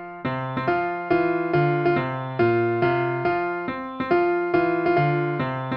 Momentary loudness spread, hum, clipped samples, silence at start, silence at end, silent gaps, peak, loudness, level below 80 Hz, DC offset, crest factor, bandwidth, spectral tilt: 7 LU; none; under 0.1%; 0 s; 0 s; none; -8 dBFS; -23 LUFS; -56 dBFS; under 0.1%; 14 dB; 5.4 kHz; -10 dB/octave